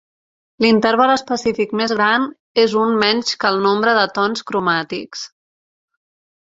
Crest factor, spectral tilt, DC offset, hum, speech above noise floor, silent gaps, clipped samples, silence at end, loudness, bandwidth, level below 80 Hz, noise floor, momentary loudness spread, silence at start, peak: 16 dB; -4 dB/octave; under 0.1%; none; over 74 dB; 2.40-2.55 s; under 0.1%; 1.25 s; -16 LUFS; 7.8 kHz; -60 dBFS; under -90 dBFS; 7 LU; 0.6 s; -2 dBFS